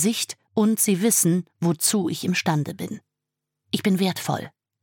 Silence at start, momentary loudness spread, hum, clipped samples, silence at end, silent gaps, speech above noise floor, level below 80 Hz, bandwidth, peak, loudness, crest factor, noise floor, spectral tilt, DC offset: 0 s; 12 LU; none; under 0.1%; 0.35 s; none; 62 dB; -76 dBFS; 17.5 kHz; -6 dBFS; -22 LUFS; 18 dB; -84 dBFS; -4 dB/octave; under 0.1%